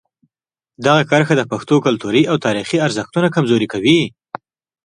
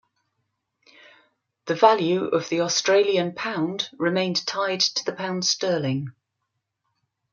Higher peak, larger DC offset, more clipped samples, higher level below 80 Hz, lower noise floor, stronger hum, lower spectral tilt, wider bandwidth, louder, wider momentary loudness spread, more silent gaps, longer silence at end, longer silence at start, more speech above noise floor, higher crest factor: about the same, 0 dBFS vs -2 dBFS; neither; neither; first, -56 dBFS vs -72 dBFS; first, -87 dBFS vs -79 dBFS; neither; first, -5.5 dB/octave vs -3.5 dB/octave; first, 11 kHz vs 7.4 kHz; first, -16 LUFS vs -23 LUFS; about the same, 7 LU vs 9 LU; neither; second, 0.75 s vs 1.2 s; second, 0.8 s vs 1.65 s; first, 72 dB vs 56 dB; second, 16 dB vs 22 dB